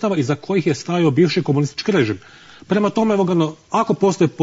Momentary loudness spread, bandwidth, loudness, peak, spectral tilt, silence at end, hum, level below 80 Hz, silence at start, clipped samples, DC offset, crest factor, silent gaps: 4 LU; 8 kHz; -18 LUFS; -4 dBFS; -6.5 dB/octave; 0 s; none; -58 dBFS; 0 s; under 0.1%; under 0.1%; 14 dB; none